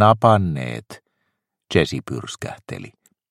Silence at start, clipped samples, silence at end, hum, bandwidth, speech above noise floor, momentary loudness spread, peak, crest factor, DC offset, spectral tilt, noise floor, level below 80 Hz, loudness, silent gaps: 0 s; under 0.1%; 0.4 s; none; 13 kHz; 55 dB; 19 LU; 0 dBFS; 20 dB; under 0.1%; -6.5 dB/octave; -75 dBFS; -48 dBFS; -21 LUFS; none